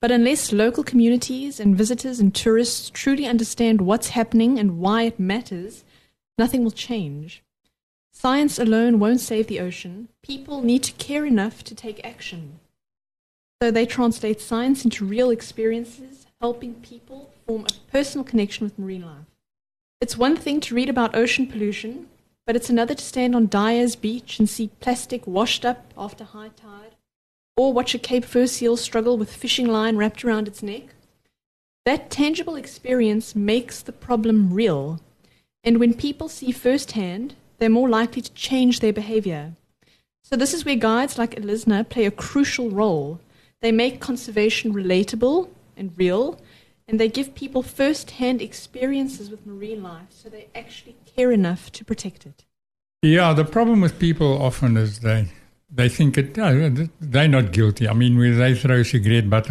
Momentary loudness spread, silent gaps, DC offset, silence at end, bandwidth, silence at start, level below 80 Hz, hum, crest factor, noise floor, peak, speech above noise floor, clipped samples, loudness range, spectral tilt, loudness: 16 LU; 7.83-8.10 s, 13.19-13.59 s, 19.81-20.00 s, 27.16-27.55 s, 31.46-31.84 s; under 0.1%; 0 s; 13 kHz; 0 s; -50 dBFS; none; 20 dB; -62 dBFS; -2 dBFS; 42 dB; under 0.1%; 7 LU; -5.5 dB/octave; -21 LUFS